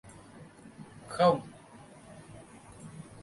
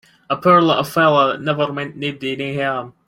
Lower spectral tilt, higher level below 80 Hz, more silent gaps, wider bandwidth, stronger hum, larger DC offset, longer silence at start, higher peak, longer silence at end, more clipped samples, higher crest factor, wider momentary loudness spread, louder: about the same, -6 dB/octave vs -6 dB/octave; second, -66 dBFS vs -58 dBFS; neither; second, 11.5 kHz vs 16.5 kHz; neither; neither; about the same, 0.35 s vs 0.3 s; second, -12 dBFS vs -2 dBFS; second, 0 s vs 0.2 s; neither; first, 24 dB vs 16 dB; first, 26 LU vs 11 LU; second, -28 LUFS vs -17 LUFS